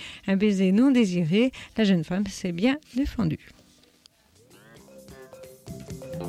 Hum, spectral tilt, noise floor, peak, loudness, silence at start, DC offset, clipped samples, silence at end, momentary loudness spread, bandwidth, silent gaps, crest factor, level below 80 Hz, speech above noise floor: none; -6.5 dB/octave; -59 dBFS; -12 dBFS; -24 LUFS; 0 s; under 0.1%; under 0.1%; 0 s; 22 LU; 14 kHz; none; 14 dB; -48 dBFS; 36 dB